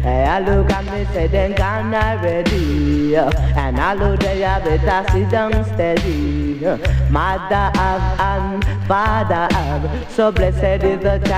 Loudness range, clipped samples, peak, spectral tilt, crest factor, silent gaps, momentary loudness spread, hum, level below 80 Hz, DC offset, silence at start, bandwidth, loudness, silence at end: 1 LU; under 0.1%; -4 dBFS; -7 dB/octave; 12 dB; none; 4 LU; none; -22 dBFS; under 0.1%; 0 s; 10 kHz; -17 LUFS; 0 s